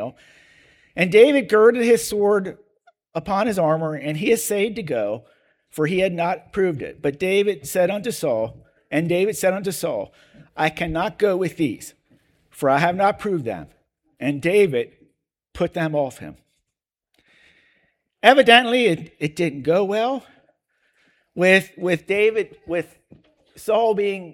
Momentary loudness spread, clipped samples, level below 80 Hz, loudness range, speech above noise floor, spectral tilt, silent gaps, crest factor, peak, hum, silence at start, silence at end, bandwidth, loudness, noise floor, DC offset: 16 LU; under 0.1%; -54 dBFS; 6 LU; 64 dB; -4.5 dB/octave; none; 22 dB; 0 dBFS; none; 0 s; 0 s; 18 kHz; -20 LUFS; -84 dBFS; under 0.1%